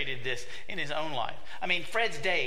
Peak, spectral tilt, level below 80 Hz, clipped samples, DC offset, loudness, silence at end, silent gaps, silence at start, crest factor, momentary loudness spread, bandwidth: -12 dBFS; -3 dB/octave; -60 dBFS; under 0.1%; 3%; -32 LUFS; 0 s; none; 0 s; 20 dB; 10 LU; 16 kHz